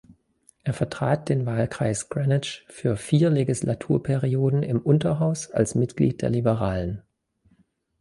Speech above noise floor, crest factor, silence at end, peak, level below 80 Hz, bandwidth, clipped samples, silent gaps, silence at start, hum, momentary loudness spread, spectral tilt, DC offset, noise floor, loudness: 41 dB; 18 dB; 1 s; -6 dBFS; -50 dBFS; 11.5 kHz; under 0.1%; none; 0.1 s; none; 7 LU; -7 dB/octave; under 0.1%; -64 dBFS; -24 LUFS